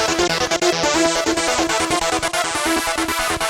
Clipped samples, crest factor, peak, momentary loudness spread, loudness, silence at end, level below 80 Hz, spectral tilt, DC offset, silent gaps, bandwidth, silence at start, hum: under 0.1%; 16 dB; -2 dBFS; 3 LU; -18 LUFS; 0 s; -42 dBFS; -2 dB/octave; under 0.1%; none; 18.5 kHz; 0 s; none